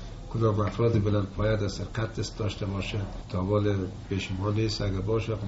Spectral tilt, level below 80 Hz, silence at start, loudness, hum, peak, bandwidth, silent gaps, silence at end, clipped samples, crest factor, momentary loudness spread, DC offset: -6.5 dB/octave; -42 dBFS; 0 s; -29 LUFS; none; -12 dBFS; 8 kHz; none; 0 s; under 0.1%; 16 dB; 7 LU; under 0.1%